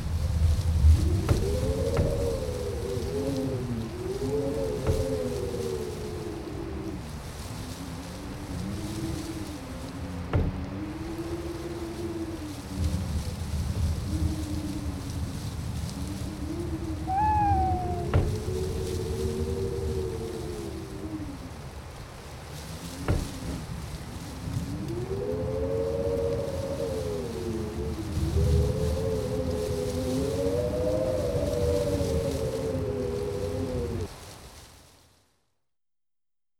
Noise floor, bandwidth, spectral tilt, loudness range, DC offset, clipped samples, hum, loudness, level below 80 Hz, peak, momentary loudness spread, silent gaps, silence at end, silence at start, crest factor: under -90 dBFS; 16.5 kHz; -6.5 dB/octave; 8 LU; under 0.1%; under 0.1%; none; -30 LUFS; -38 dBFS; -10 dBFS; 11 LU; none; 1.8 s; 0 s; 20 dB